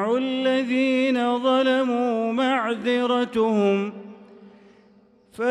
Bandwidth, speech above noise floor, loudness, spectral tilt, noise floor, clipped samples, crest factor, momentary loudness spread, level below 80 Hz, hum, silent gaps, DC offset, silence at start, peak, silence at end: 10.5 kHz; 34 dB; -22 LUFS; -5.5 dB/octave; -56 dBFS; under 0.1%; 12 dB; 3 LU; -68 dBFS; none; none; under 0.1%; 0 s; -10 dBFS; 0 s